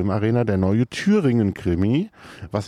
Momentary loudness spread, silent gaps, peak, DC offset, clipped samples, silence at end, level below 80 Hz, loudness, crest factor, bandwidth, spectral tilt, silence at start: 10 LU; none; -8 dBFS; under 0.1%; under 0.1%; 0 s; -46 dBFS; -21 LUFS; 12 dB; 11 kHz; -7.5 dB/octave; 0 s